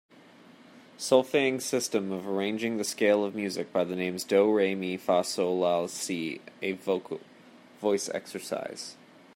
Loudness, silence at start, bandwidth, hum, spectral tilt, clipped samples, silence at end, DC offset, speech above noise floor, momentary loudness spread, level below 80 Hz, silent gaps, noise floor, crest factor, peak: -29 LUFS; 0.75 s; 16 kHz; none; -4 dB/octave; under 0.1%; 0.45 s; under 0.1%; 26 dB; 11 LU; -78 dBFS; none; -54 dBFS; 22 dB; -8 dBFS